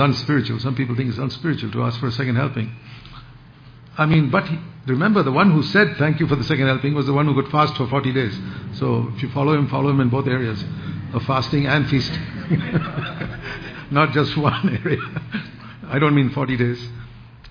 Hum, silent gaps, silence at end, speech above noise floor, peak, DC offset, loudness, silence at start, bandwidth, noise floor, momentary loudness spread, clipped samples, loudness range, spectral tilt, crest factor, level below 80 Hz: none; none; 0 s; 24 dB; -2 dBFS; under 0.1%; -20 LUFS; 0 s; 5.2 kHz; -44 dBFS; 13 LU; under 0.1%; 5 LU; -8 dB/octave; 18 dB; -46 dBFS